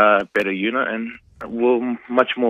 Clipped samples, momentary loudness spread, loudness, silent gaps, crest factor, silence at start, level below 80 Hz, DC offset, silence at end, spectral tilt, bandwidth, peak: under 0.1%; 13 LU; -20 LUFS; none; 18 dB; 0 s; -60 dBFS; under 0.1%; 0 s; -6.5 dB/octave; 8 kHz; 0 dBFS